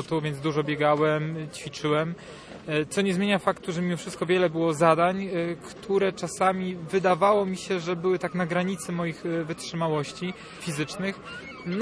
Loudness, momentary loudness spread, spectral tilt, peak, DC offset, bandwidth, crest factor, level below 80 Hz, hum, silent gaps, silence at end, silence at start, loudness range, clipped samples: -26 LUFS; 12 LU; -5.5 dB/octave; -6 dBFS; under 0.1%; 11 kHz; 20 dB; -60 dBFS; none; none; 0 s; 0 s; 4 LU; under 0.1%